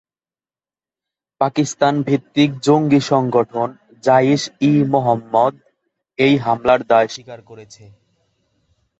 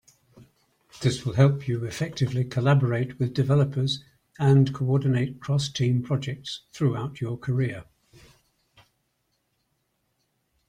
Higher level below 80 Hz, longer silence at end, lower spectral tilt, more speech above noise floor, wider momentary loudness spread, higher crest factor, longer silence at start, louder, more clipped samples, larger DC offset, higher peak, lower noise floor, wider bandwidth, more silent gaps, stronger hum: about the same, -58 dBFS vs -58 dBFS; second, 1.35 s vs 2.85 s; about the same, -6 dB/octave vs -7 dB/octave; first, over 74 dB vs 50 dB; about the same, 9 LU vs 10 LU; about the same, 16 dB vs 18 dB; first, 1.4 s vs 0.35 s; first, -16 LUFS vs -25 LUFS; neither; neither; first, -2 dBFS vs -8 dBFS; first, under -90 dBFS vs -74 dBFS; second, 8.2 kHz vs 10 kHz; neither; neither